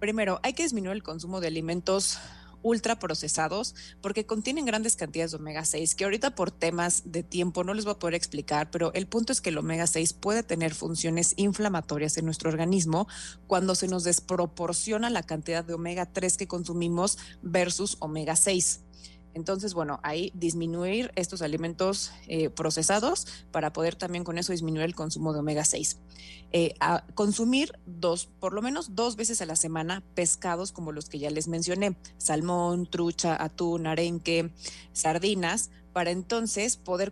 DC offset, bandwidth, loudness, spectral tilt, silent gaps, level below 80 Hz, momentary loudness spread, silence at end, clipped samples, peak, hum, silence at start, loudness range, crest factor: under 0.1%; 12.5 kHz; -28 LUFS; -3.5 dB/octave; none; -54 dBFS; 7 LU; 0 s; under 0.1%; -8 dBFS; none; 0 s; 2 LU; 20 dB